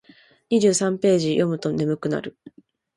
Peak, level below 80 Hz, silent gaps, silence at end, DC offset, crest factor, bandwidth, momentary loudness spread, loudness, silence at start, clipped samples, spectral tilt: -6 dBFS; -62 dBFS; none; 0.65 s; under 0.1%; 16 dB; 11.5 kHz; 8 LU; -21 LUFS; 0.5 s; under 0.1%; -5.5 dB/octave